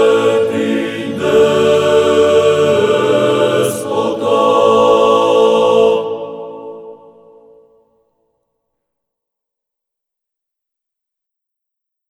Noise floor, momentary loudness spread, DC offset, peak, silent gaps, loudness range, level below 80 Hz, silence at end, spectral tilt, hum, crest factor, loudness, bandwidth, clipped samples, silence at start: -81 dBFS; 13 LU; under 0.1%; 0 dBFS; none; 7 LU; -56 dBFS; 5.15 s; -5 dB/octave; none; 14 dB; -12 LUFS; 14.5 kHz; under 0.1%; 0 s